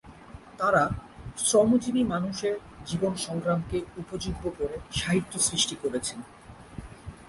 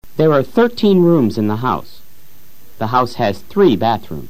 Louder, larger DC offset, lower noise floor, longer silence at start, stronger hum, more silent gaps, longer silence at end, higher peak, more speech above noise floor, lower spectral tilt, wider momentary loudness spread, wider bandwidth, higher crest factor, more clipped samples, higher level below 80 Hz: second, -27 LUFS vs -15 LUFS; second, under 0.1% vs 4%; about the same, -47 dBFS vs -48 dBFS; about the same, 0.05 s vs 0 s; neither; neither; about the same, 0 s vs 0 s; second, -10 dBFS vs 0 dBFS; second, 20 dB vs 34 dB; second, -4 dB/octave vs -7.5 dB/octave; first, 21 LU vs 8 LU; second, 11.5 kHz vs 15 kHz; first, 20 dB vs 14 dB; neither; about the same, -48 dBFS vs -48 dBFS